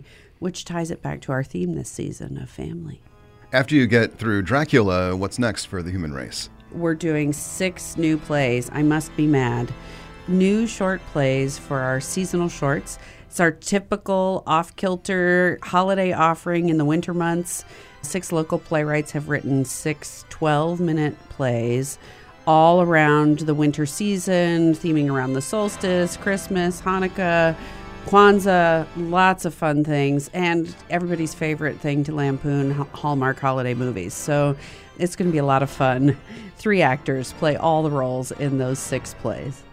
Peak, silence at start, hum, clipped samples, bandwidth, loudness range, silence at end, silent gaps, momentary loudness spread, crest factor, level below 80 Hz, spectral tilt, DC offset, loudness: 0 dBFS; 0 s; none; under 0.1%; 16 kHz; 5 LU; 0.05 s; none; 12 LU; 22 dB; -48 dBFS; -6 dB/octave; under 0.1%; -21 LUFS